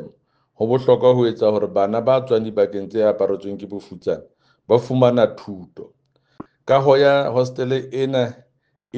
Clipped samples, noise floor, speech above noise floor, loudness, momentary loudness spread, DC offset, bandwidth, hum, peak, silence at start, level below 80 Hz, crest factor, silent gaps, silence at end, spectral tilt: under 0.1%; -57 dBFS; 39 dB; -18 LUFS; 15 LU; under 0.1%; 7.4 kHz; none; 0 dBFS; 0 s; -64 dBFS; 20 dB; none; 0 s; -7.5 dB/octave